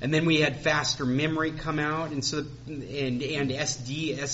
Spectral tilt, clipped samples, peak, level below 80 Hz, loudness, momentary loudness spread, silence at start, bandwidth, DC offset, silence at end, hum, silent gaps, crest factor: -4 dB/octave; under 0.1%; -10 dBFS; -52 dBFS; -27 LUFS; 9 LU; 0 s; 8 kHz; under 0.1%; 0 s; none; none; 18 dB